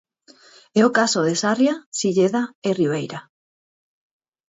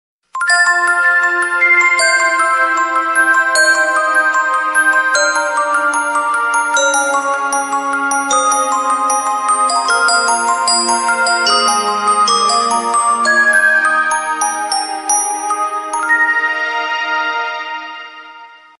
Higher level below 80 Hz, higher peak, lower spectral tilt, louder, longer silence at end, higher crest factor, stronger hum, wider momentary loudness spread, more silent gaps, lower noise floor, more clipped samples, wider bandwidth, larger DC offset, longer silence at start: about the same, -68 dBFS vs -66 dBFS; about the same, -2 dBFS vs -2 dBFS; first, -4.5 dB/octave vs 1 dB/octave; second, -20 LUFS vs -12 LUFS; first, 1.3 s vs 0.25 s; first, 20 dB vs 12 dB; neither; about the same, 8 LU vs 7 LU; first, 1.86-1.92 s, 2.55-2.62 s vs none; first, -52 dBFS vs -38 dBFS; neither; second, 8 kHz vs 12 kHz; neither; first, 0.75 s vs 0.35 s